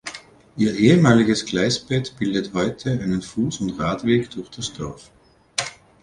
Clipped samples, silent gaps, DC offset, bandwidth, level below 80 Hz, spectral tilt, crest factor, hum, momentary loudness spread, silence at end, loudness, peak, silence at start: under 0.1%; none; under 0.1%; 11 kHz; -50 dBFS; -5.5 dB/octave; 18 dB; none; 17 LU; 0.3 s; -21 LUFS; -2 dBFS; 0.05 s